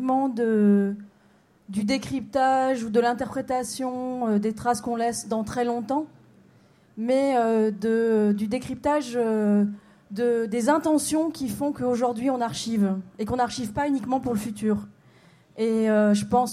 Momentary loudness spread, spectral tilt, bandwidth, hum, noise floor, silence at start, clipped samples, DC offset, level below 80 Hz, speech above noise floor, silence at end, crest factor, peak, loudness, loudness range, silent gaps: 8 LU; -5.5 dB/octave; 15 kHz; none; -59 dBFS; 0 s; under 0.1%; under 0.1%; -58 dBFS; 35 dB; 0 s; 16 dB; -8 dBFS; -25 LUFS; 3 LU; none